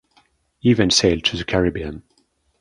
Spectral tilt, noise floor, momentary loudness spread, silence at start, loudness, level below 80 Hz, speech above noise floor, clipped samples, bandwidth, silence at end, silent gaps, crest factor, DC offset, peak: -4 dB/octave; -64 dBFS; 16 LU; 0.65 s; -18 LUFS; -40 dBFS; 45 dB; under 0.1%; 11.5 kHz; 0.6 s; none; 20 dB; under 0.1%; -2 dBFS